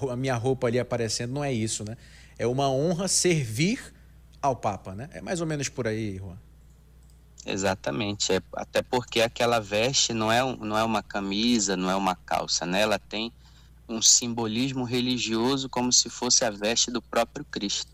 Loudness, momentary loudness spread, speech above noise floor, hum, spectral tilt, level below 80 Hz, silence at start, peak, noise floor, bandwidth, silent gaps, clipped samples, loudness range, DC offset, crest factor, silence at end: -25 LUFS; 11 LU; 26 dB; none; -3 dB/octave; -52 dBFS; 0 s; -6 dBFS; -53 dBFS; 16 kHz; none; under 0.1%; 8 LU; under 0.1%; 20 dB; 0.1 s